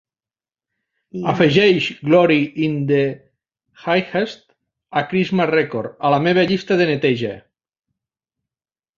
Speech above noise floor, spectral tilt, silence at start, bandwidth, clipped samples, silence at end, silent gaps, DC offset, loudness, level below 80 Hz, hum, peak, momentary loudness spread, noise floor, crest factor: over 73 dB; -7 dB/octave; 1.15 s; 7.4 kHz; under 0.1%; 1.6 s; none; under 0.1%; -18 LUFS; -58 dBFS; none; 0 dBFS; 12 LU; under -90 dBFS; 18 dB